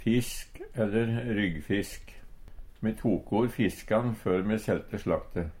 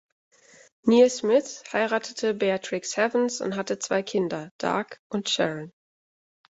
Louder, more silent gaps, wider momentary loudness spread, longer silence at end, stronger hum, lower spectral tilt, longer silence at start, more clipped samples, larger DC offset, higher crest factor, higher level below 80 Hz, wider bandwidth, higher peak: second, -30 LUFS vs -25 LUFS; second, none vs 4.51-4.59 s, 4.99-5.10 s; about the same, 9 LU vs 11 LU; second, 0 s vs 0.8 s; neither; first, -6.5 dB/octave vs -4 dB/octave; second, 0 s vs 0.85 s; neither; neither; about the same, 16 dB vs 20 dB; first, -46 dBFS vs -70 dBFS; first, 16 kHz vs 8 kHz; second, -14 dBFS vs -6 dBFS